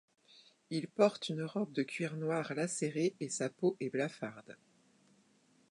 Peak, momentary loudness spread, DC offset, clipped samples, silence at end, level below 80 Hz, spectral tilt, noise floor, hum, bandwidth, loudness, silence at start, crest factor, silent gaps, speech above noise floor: -14 dBFS; 10 LU; under 0.1%; under 0.1%; 1.2 s; -86 dBFS; -5 dB/octave; -70 dBFS; none; 11 kHz; -36 LUFS; 0.7 s; 22 dB; none; 34 dB